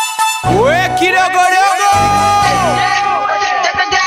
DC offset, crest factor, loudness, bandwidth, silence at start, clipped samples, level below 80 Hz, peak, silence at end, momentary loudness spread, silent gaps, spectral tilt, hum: under 0.1%; 12 dB; -11 LUFS; 16 kHz; 0 s; under 0.1%; -36 dBFS; 0 dBFS; 0 s; 4 LU; none; -3 dB/octave; none